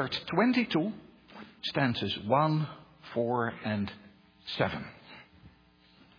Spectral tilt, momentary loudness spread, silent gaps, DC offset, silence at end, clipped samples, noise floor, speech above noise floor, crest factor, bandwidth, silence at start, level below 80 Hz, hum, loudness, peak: -7.5 dB/octave; 24 LU; none; under 0.1%; 0.7 s; under 0.1%; -61 dBFS; 32 dB; 20 dB; 5.4 kHz; 0 s; -64 dBFS; none; -31 LUFS; -12 dBFS